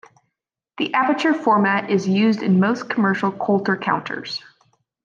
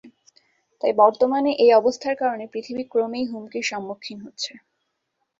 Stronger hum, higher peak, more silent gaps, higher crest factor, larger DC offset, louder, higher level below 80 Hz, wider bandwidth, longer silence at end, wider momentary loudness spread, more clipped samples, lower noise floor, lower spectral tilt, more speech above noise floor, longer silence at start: neither; second, -6 dBFS vs -2 dBFS; neither; about the same, 16 dB vs 20 dB; neither; first, -19 LUFS vs -22 LUFS; about the same, -70 dBFS vs -68 dBFS; about the same, 7.4 kHz vs 7.8 kHz; second, 0.65 s vs 0.8 s; second, 10 LU vs 15 LU; neither; first, -80 dBFS vs -76 dBFS; first, -6.5 dB/octave vs -3.5 dB/octave; first, 61 dB vs 55 dB; first, 0.8 s vs 0.05 s